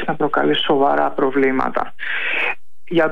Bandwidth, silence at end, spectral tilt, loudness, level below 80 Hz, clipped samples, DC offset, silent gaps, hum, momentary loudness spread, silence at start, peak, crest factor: 6.6 kHz; 0 s; -6.5 dB/octave; -18 LUFS; -58 dBFS; under 0.1%; 5%; none; none; 7 LU; 0 s; -6 dBFS; 14 dB